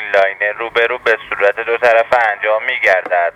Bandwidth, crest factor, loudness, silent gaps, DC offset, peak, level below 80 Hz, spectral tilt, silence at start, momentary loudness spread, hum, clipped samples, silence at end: 13 kHz; 14 dB; -14 LUFS; none; under 0.1%; 0 dBFS; -56 dBFS; -3 dB/octave; 0 s; 4 LU; none; under 0.1%; 0.05 s